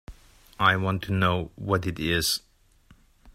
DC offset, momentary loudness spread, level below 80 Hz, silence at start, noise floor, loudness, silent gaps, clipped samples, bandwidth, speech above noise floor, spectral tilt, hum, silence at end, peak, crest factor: under 0.1%; 6 LU; -50 dBFS; 0.1 s; -58 dBFS; -25 LUFS; none; under 0.1%; 16 kHz; 33 dB; -4.5 dB/octave; none; 0.05 s; -6 dBFS; 22 dB